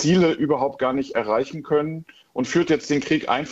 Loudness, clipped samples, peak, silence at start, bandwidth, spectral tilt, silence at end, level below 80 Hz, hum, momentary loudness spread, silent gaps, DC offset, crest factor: -22 LUFS; under 0.1%; -6 dBFS; 0 s; 8 kHz; -5.5 dB/octave; 0 s; -56 dBFS; none; 9 LU; none; under 0.1%; 16 dB